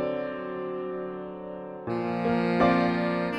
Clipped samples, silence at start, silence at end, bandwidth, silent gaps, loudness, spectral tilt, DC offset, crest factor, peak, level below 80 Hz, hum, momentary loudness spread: under 0.1%; 0 s; 0 s; 8.4 kHz; none; -28 LUFS; -8 dB/octave; under 0.1%; 18 dB; -10 dBFS; -56 dBFS; none; 15 LU